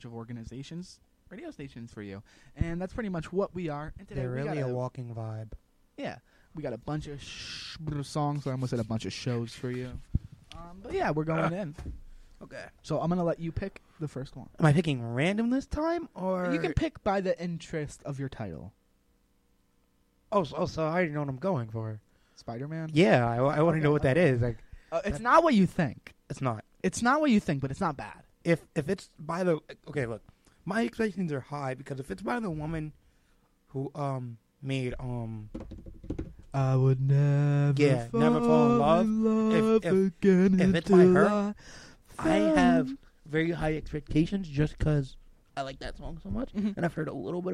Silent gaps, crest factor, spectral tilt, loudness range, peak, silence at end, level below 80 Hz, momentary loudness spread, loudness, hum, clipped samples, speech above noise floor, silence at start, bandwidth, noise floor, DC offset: none; 22 dB; -7 dB/octave; 12 LU; -8 dBFS; 0 s; -48 dBFS; 20 LU; -29 LUFS; none; under 0.1%; 40 dB; 0.05 s; 11.5 kHz; -68 dBFS; under 0.1%